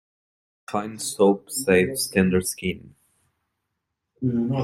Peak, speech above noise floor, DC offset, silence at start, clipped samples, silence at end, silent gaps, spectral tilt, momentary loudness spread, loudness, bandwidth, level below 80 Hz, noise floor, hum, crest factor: -6 dBFS; 58 dB; under 0.1%; 0.7 s; under 0.1%; 0 s; none; -5 dB/octave; 10 LU; -23 LUFS; 16 kHz; -58 dBFS; -80 dBFS; none; 20 dB